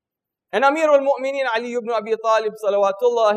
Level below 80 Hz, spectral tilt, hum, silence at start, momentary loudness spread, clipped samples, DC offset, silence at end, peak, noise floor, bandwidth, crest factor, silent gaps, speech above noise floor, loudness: -80 dBFS; -3.5 dB/octave; none; 0.55 s; 7 LU; under 0.1%; under 0.1%; 0 s; -4 dBFS; -85 dBFS; 12 kHz; 14 dB; none; 66 dB; -19 LUFS